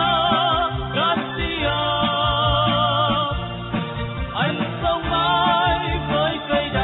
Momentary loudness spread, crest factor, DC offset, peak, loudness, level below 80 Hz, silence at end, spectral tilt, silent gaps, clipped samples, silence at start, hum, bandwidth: 8 LU; 14 dB; under 0.1%; -6 dBFS; -20 LUFS; -34 dBFS; 0 s; -10.5 dB/octave; none; under 0.1%; 0 s; none; 4.1 kHz